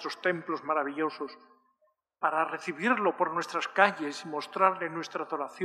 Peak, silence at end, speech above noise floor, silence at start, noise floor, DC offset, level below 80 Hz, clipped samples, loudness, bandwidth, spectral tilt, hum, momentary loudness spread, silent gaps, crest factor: -6 dBFS; 0 s; 43 dB; 0 s; -73 dBFS; under 0.1%; under -90 dBFS; under 0.1%; -30 LUFS; 13.5 kHz; -4.5 dB/octave; none; 11 LU; none; 24 dB